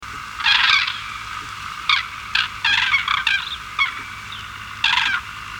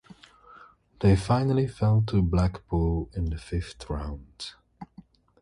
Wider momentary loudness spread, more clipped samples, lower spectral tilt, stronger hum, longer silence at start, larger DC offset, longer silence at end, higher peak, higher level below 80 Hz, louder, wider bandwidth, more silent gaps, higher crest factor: about the same, 16 LU vs 17 LU; neither; second, 0 dB/octave vs -8 dB/octave; neither; second, 0 s vs 1 s; neither; second, 0 s vs 0.55 s; first, -2 dBFS vs -10 dBFS; second, -48 dBFS vs -36 dBFS; first, -18 LUFS vs -26 LUFS; first, 19.5 kHz vs 11 kHz; neither; about the same, 20 dB vs 18 dB